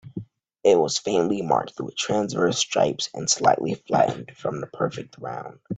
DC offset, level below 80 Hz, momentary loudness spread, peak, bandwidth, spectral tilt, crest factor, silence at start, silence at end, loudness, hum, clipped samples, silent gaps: under 0.1%; -62 dBFS; 14 LU; -4 dBFS; 9.4 kHz; -4 dB/octave; 20 dB; 0.05 s; 0 s; -23 LUFS; none; under 0.1%; none